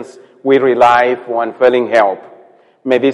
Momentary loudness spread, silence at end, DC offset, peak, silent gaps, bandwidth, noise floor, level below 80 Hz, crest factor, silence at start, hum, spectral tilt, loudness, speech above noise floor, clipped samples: 12 LU; 0 s; under 0.1%; 0 dBFS; none; 10.5 kHz; -45 dBFS; -56 dBFS; 14 dB; 0 s; none; -5.5 dB/octave; -12 LUFS; 33 dB; under 0.1%